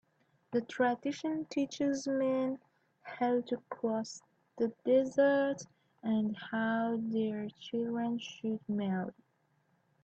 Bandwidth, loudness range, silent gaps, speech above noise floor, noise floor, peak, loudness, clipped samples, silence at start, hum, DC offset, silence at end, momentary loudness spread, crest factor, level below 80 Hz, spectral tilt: 8.4 kHz; 3 LU; none; 42 dB; -75 dBFS; -16 dBFS; -34 LUFS; under 0.1%; 0.5 s; none; under 0.1%; 0.9 s; 12 LU; 18 dB; -80 dBFS; -5.5 dB/octave